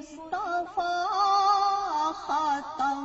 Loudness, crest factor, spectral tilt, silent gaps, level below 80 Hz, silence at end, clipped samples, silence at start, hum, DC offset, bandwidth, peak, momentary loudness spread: -27 LUFS; 14 dB; -2 dB/octave; none; -62 dBFS; 0 s; under 0.1%; 0 s; none; under 0.1%; 8 kHz; -12 dBFS; 8 LU